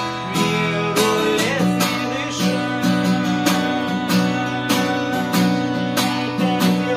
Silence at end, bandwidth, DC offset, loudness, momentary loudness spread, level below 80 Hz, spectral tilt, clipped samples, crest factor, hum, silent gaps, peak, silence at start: 0 s; 15.5 kHz; under 0.1%; -19 LUFS; 3 LU; -54 dBFS; -4.5 dB/octave; under 0.1%; 16 dB; none; none; -2 dBFS; 0 s